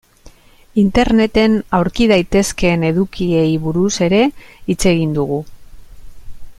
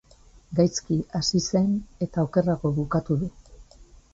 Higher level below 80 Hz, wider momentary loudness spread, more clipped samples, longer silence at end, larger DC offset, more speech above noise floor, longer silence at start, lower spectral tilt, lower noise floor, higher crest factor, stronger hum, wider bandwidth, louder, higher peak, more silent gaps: first, -32 dBFS vs -48 dBFS; about the same, 7 LU vs 6 LU; neither; second, 0.05 s vs 0.3 s; neither; about the same, 29 dB vs 29 dB; second, 0.25 s vs 0.5 s; about the same, -5.5 dB/octave vs -6 dB/octave; second, -43 dBFS vs -53 dBFS; about the same, 14 dB vs 18 dB; neither; first, 15 kHz vs 8 kHz; first, -15 LUFS vs -25 LUFS; first, 0 dBFS vs -8 dBFS; neither